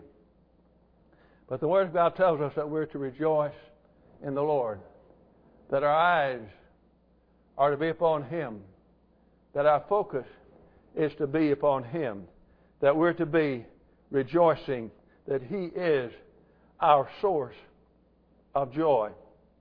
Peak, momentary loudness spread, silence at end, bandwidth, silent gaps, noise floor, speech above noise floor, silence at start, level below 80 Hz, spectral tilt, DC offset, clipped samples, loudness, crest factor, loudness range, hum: -8 dBFS; 14 LU; 0.45 s; 5.2 kHz; none; -64 dBFS; 37 dB; 1.5 s; -64 dBFS; -9.5 dB/octave; under 0.1%; under 0.1%; -28 LUFS; 20 dB; 3 LU; none